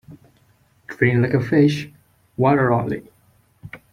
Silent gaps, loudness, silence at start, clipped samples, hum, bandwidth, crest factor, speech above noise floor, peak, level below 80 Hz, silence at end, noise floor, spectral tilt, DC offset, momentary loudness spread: none; -19 LUFS; 0.1 s; under 0.1%; none; 13 kHz; 20 dB; 41 dB; -2 dBFS; -54 dBFS; 0.15 s; -58 dBFS; -8 dB/octave; under 0.1%; 22 LU